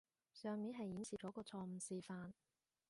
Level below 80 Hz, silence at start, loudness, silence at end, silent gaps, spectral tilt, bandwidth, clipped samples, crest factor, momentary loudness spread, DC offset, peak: -82 dBFS; 0.35 s; -50 LUFS; 0.55 s; none; -5.5 dB/octave; 11.5 kHz; under 0.1%; 14 dB; 10 LU; under 0.1%; -36 dBFS